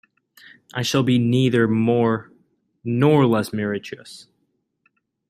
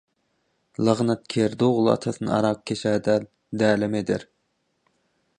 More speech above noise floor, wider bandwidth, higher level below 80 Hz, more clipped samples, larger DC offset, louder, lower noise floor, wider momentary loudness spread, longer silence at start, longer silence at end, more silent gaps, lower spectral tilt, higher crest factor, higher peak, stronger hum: about the same, 52 dB vs 50 dB; first, 15 kHz vs 10 kHz; about the same, -62 dBFS vs -60 dBFS; neither; neither; first, -20 LUFS vs -23 LUFS; about the same, -71 dBFS vs -72 dBFS; first, 17 LU vs 6 LU; about the same, 0.75 s vs 0.8 s; about the same, 1.1 s vs 1.15 s; neither; about the same, -6.5 dB/octave vs -6.5 dB/octave; about the same, 18 dB vs 20 dB; about the same, -4 dBFS vs -4 dBFS; neither